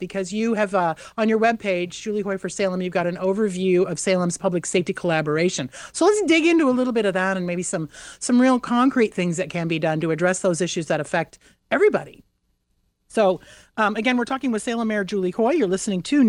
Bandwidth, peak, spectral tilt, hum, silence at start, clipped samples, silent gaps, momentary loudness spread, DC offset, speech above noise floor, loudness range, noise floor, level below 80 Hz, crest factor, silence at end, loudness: 12 kHz; -6 dBFS; -5 dB/octave; none; 0 s; under 0.1%; none; 8 LU; under 0.1%; 48 dB; 4 LU; -69 dBFS; -60 dBFS; 16 dB; 0 s; -22 LUFS